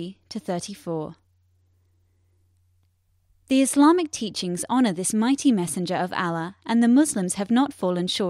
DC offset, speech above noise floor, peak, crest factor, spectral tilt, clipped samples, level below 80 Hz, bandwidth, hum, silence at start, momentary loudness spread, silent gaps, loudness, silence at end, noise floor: under 0.1%; 43 dB; -6 dBFS; 18 dB; -4.5 dB/octave; under 0.1%; -66 dBFS; 15 kHz; none; 0 s; 13 LU; none; -23 LUFS; 0 s; -66 dBFS